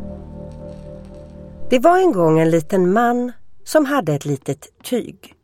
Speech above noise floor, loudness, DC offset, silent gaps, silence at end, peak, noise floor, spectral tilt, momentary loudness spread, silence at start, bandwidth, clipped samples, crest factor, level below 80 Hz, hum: 20 dB; -17 LUFS; under 0.1%; none; 0 s; -2 dBFS; -37 dBFS; -6.5 dB/octave; 23 LU; 0 s; 16.5 kHz; under 0.1%; 16 dB; -44 dBFS; none